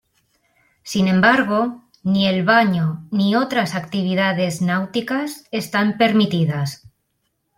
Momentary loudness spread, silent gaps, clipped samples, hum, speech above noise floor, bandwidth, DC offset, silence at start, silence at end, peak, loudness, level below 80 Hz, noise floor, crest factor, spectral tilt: 11 LU; none; under 0.1%; none; 53 dB; 16 kHz; under 0.1%; 0.85 s; 0.8 s; -2 dBFS; -19 LUFS; -58 dBFS; -71 dBFS; 18 dB; -6 dB/octave